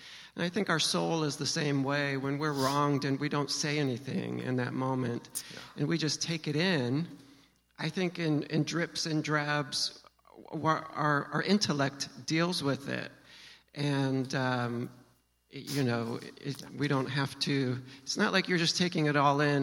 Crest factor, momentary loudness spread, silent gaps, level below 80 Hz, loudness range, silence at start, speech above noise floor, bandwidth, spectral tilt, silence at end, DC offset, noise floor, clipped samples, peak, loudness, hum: 20 dB; 11 LU; none; -72 dBFS; 4 LU; 0 s; 36 dB; 16.5 kHz; -4.5 dB/octave; 0 s; under 0.1%; -67 dBFS; under 0.1%; -12 dBFS; -31 LUFS; none